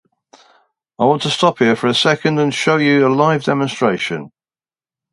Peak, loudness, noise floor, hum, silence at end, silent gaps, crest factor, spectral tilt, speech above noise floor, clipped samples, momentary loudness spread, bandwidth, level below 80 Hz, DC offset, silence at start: 0 dBFS; -15 LUFS; under -90 dBFS; none; 0.85 s; none; 16 dB; -5 dB/octave; over 75 dB; under 0.1%; 5 LU; 11.5 kHz; -62 dBFS; under 0.1%; 1 s